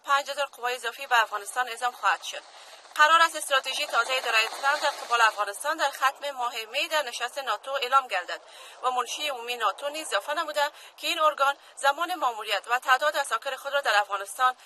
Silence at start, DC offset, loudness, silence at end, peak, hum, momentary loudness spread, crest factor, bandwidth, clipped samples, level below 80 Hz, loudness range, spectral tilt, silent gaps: 0.05 s; under 0.1%; -26 LUFS; 0.15 s; -6 dBFS; none; 9 LU; 20 dB; 13.5 kHz; under 0.1%; -84 dBFS; 5 LU; 2.5 dB/octave; none